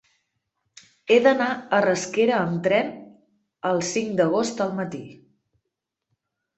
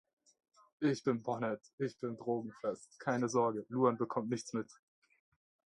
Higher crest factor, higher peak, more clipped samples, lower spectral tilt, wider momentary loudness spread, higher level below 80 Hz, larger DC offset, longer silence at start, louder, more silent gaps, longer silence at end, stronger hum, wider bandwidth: about the same, 20 dB vs 22 dB; first, -4 dBFS vs -16 dBFS; neither; second, -4.5 dB/octave vs -6 dB/octave; first, 14 LU vs 9 LU; first, -68 dBFS vs -82 dBFS; neither; first, 1.05 s vs 0.8 s; first, -22 LUFS vs -37 LUFS; second, none vs 1.73-1.78 s; first, 1.45 s vs 1.15 s; neither; second, 8.2 kHz vs 11.5 kHz